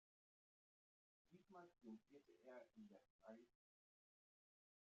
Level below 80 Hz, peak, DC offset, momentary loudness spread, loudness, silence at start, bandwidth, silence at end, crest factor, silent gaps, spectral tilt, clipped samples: under -90 dBFS; -48 dBFS; under 0.1%; 5 LU; -66 LUFS; 1.25 s; 7 kHz; 1.35 s; 20 dB; 3.10-3.19 s; -6 dB/octave; under 0.1%